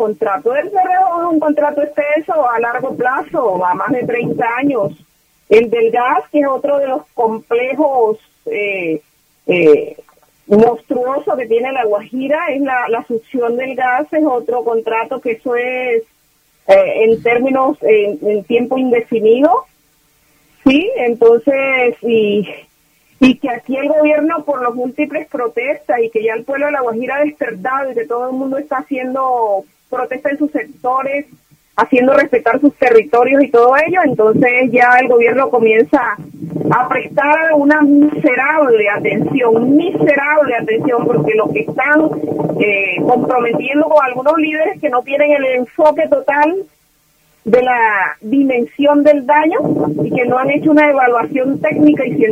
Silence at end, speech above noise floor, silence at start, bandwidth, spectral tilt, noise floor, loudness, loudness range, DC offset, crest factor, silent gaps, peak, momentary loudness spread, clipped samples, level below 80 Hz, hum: 0 s; 43 dB; 0 s; 14.5 kHz; -7 dB/octave; -56 dBFS; -13 LUFS; 6 LU; under 0.1%; 14 dB; none; 0 dBFS; 9 LU; under 0.1%; -56 dBFS; none